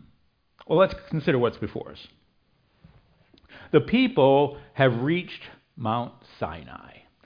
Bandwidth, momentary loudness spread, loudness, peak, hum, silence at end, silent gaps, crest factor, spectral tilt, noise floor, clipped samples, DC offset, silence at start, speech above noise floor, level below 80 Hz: 5.2 kHz; 21 LU; -24 LUFS; -4 dBFS; none; 0.5 s; none; 22 dB; -9 dB/octave; -66 dBFS; under 0.1%; under 0.1%; 0.7 s; 42 dB; -54 dBFS